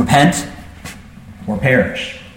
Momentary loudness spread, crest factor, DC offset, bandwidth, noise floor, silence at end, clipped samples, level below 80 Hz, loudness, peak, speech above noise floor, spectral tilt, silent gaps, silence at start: 21 LU; 16 dB; under 0.1%; 16.5 kHz; -36 dBFS; 0.05 s; under 0.1%; -40 dBFS; -15 LUFS; 0 dBFS; 22 dB; -5 dB/octave; none; 0 s